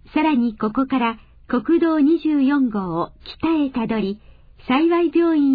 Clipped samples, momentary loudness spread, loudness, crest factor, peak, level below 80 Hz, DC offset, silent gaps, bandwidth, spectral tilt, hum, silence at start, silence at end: under 0.1%; 9 LU; -20 LUFS; 12 dB; -6 dBFS; -48 dBFS; under 0.1%; none; 5 kHz; -9.5 dB/octave; none; 0.15 s; 0 s